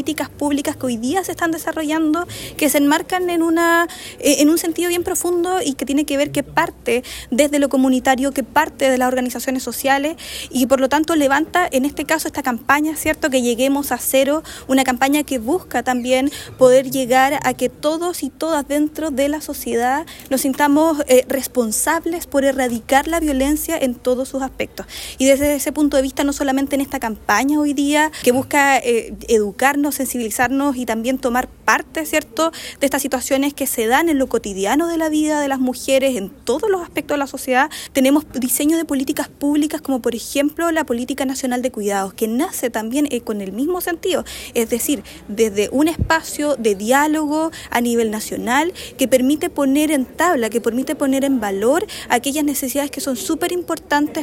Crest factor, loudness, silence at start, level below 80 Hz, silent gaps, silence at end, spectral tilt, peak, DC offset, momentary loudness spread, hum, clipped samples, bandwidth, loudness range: 18 dB; -18 LUFS; 0 s; -44 dBFS; none; 0 s; -3 dB/octave; 0 dBFS; under 0.1%; 7 LU; none; under 0.1%; 16.5 kHz; 3 LU